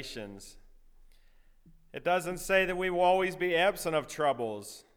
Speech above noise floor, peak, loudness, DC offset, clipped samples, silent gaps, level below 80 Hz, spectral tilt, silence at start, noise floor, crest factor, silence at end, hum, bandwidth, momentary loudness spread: 29 dB; -12 dBFS; -29 LUFS; under 0.1%; under 0.1%; none; -54 dBFS; -4 dB/octave; 0 s; -59 dBFS; 20 dB; 0.15 s; none; 18.5 kHz; 16 LU